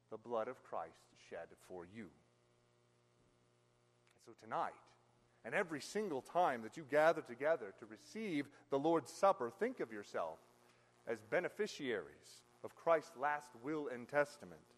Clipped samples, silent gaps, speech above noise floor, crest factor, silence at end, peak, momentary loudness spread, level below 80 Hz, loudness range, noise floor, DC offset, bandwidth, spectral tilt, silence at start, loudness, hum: under 0.1%; none; 34 dB; 22 dB; 0.2 s; -20 dBFS; 20 LU; -86 dBFS; 15 LU; -75 dBFS; under 0.1%; 13 kHz; -5 dB/octave; 0.1 s; -40 LUFS; 60 Hz at -75 dBFS